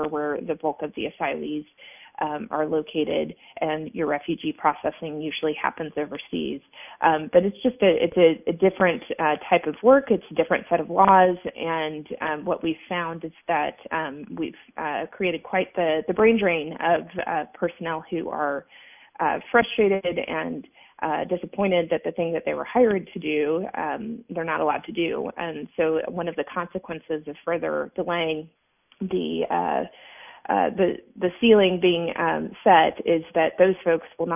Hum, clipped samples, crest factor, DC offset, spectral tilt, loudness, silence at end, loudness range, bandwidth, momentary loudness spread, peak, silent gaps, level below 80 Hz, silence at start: none; under 0.1%; 20 dB; under 0.1%; -9.5 dB/octave; -24 LUFS; 0 s; 7 LU; 3.7 kHz; 13 LU; -4 dBFS; none; -60 dBFS; 0 s